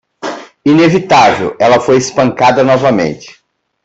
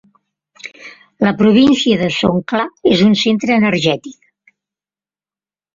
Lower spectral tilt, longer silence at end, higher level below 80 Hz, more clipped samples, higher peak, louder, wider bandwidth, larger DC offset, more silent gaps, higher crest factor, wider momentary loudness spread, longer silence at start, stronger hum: about the same, -5.5 dB/octave vs -5.5 dB/octave; second, 0.55 s vs 1.65 s; about the same, -48 dBFS vs -50 dBFS; neither; about the same, 0 dBFS vs 0 dBFS; first, -9 LUFS vs -13 LUFS; about the same, 8.2 kHz vs 7.6 kHz; neither; neither; about the same, 10 dB vs 14 dB; second, 15 LU vs 18 LU; second, 0.25 s vs 0.65 s; second, none vs 50 Hz at -35 dBFS